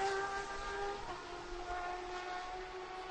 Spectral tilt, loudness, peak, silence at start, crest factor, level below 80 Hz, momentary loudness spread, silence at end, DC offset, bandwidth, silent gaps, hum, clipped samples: -3 dB/octave; -42 LUFS; -24 dBFS; 0 s; 18 dB; -56 dBFS; 7 LU; 0 s; under 0.1%; 10 kHz; none; none; under 0.1%